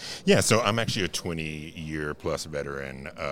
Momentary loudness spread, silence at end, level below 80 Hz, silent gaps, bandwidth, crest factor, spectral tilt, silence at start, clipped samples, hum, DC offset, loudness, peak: 14 LU; 0 s; -52 dBFS; none; 17.5 kHz; 22 dB; -4 dB/octave; 0 s; under 0.1%; none; under 0.1%; -27 LUFS; -6 dBFS